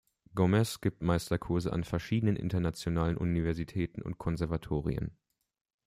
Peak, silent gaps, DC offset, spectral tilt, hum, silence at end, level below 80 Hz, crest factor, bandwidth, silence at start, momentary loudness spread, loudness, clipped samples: -14 dBFS; none; under 0.1%; -7 dB/octave; none; 0.75 s; -50 dBFS; 18 dB; 15.5 kHz; 0.35 s; 7 LU; -32 LUFS; under 0.1%